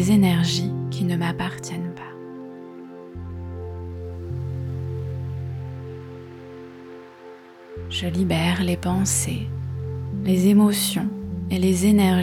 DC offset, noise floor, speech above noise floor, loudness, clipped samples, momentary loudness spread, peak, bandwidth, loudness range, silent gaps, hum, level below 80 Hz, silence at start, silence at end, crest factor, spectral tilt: under 0.1%; -43 dBFS; 23 dB; -23 LUFS; under 0.1%; 22 LU; -6 dBFS; 18 kHz; 12 LU; none; none; -46 dBFS; 0 s; 0 s; 16 dB; -5.5 dB/octave